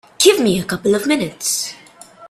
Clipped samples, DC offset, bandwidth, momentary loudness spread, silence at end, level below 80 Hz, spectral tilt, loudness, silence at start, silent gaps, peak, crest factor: under 0.1%; under 0.1%; 15.5 kHz; 8 LU; 0.05 s; -54 dBFS; -3 dB/octave; -16 LUFS; 0.2 s; none; 0 dBFS; 18 dB